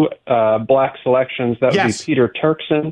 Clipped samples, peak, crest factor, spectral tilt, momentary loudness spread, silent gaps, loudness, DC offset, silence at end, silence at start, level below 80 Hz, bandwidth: under 0.1%; -2 dBFS; 14 dB; -6 dB/octave; 3 LU; none; -17 LUFS; under 0.1%; 0 s; 0 s; -56 dBFS; 10.5 kHz